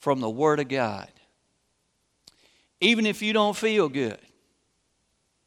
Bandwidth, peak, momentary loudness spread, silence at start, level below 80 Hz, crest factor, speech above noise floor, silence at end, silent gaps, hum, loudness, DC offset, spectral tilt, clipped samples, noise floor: 16 kHz; -6 dBFS; 10 LU; 0 s; -72 dBFS; 20 dB; 48 dB; 1.3 s; none; none; -24 LUFS; under 0.1%; -4.5 dB/octave; under 0.1%; -73 dBFS